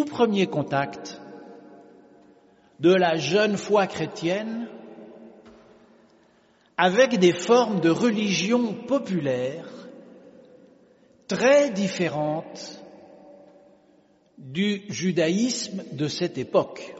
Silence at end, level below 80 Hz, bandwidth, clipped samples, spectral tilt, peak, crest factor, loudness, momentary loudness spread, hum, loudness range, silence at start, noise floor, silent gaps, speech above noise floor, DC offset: 0 s; -70 dBFS; 8 kHz; under 0.1%; -4.5 dB/octave; -4 dBFS; 20 dB; -23 LUFS; 20 LU; none; 7 LU; 0 s; -60 dBFS; none; 37 dB; under 0.1%